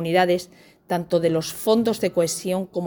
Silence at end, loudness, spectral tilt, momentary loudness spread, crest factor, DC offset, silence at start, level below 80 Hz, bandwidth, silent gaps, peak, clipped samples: 0 s; -22 LUFS; -5 dB/octave; 7 LU; 16 dB; under 0.1%; 0 s; -60 dBFS; over 20 kHz; none; -6 dBFS; under 0.1%